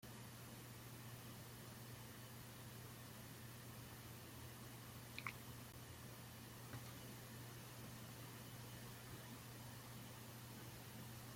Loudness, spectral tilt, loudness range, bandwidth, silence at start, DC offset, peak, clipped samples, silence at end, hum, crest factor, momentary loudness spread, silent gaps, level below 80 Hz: -55 LUFS; -4 dB/octave; 1 LU; 16.5 kHz; 0 s; under 0.1%; -28 dBFS; under 0.1%; 0 s; none; 28 dB; 2 LU; none; -74 dBFS